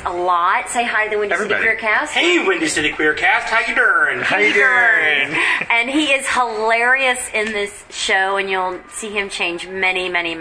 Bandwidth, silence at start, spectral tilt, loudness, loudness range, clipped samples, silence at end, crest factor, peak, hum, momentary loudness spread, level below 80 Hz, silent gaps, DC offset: 11 kHz; 0 s; -2 dB/octave; -16 LUFS; 4 LU; under 0.1%; 0 s; 14 dB; -4 dBFS; none; 9 LU; -50 dBFS; none; under 0.1%